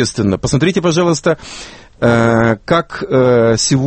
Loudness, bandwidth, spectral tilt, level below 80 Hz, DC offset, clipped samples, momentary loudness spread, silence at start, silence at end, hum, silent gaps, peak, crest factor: -13 LUFS; 8.8 kHz; -5 dB/octave; -40 dBFS; under 0.1%; under 0.1%; 9 LU; 0 s; 0 s; none; none; 0 dBFS; 14 dB